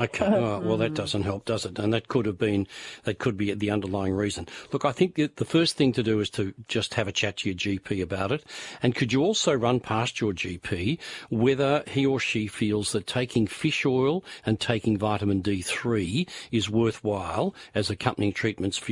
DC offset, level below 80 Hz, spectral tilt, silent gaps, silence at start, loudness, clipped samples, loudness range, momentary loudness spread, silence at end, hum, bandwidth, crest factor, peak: under 0.1%; -56 dBFS; -5.5 dB/octave; none; 0 s; -26 LUFS; under 0.1%; 2 LU; 6 LU; 0 s; none; 11.5 kHz; 20 dB; -6 dBFS